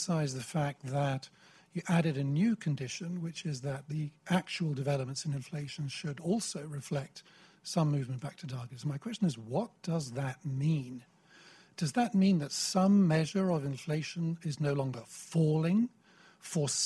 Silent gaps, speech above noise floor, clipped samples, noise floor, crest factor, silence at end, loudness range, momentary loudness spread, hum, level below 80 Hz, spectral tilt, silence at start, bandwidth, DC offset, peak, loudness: none; 27 dB; under 0.1%; -59 dBFS; 18 dB; 0 s; 6 LU; 12 LU; none; -70 dBFS; -5.5 dB/octave; 0 s; 12.5 kHz; under 0.1%; -16 dBFS; -33 LUFS